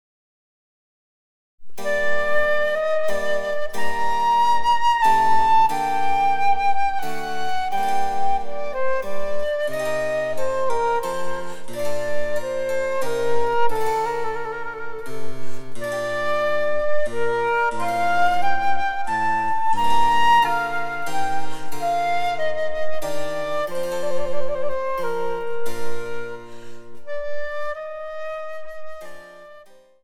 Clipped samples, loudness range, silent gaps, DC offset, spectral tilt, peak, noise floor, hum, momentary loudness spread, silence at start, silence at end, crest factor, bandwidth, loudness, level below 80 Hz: under 0.1%; 9 LU; none; under 0.1%; -3.5 dB/octave; -6 dBFS; -46 dBFS; none; 14 LU; 1.6 s; 0.45 s; 12 dB; 16.5 kHz; -23 LUFS; -48 dBFS